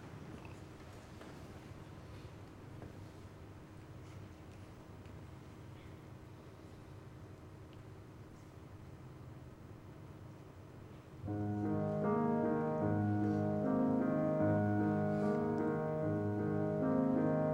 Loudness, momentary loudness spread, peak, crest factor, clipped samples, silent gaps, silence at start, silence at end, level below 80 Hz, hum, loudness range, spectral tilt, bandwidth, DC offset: -35 LUFS; 21 LU; -22 dBFS; 16 dB; under 0.1%; none; 0 s; 0 s; -64 dBFS; none; 19 LU; -9 dB/octave; 15.5 kHz; under 0.1%